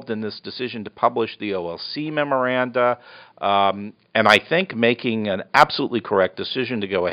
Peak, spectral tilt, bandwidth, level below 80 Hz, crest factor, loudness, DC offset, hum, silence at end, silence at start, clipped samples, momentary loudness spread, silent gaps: 0 dBFS; -2.5 dB/octave; 5.6 kHz; -62 dBFS; 22 dB; -21 LUFS; under 0.1%; none; 0 s; 0 s; under 0.1%; 12 LU; none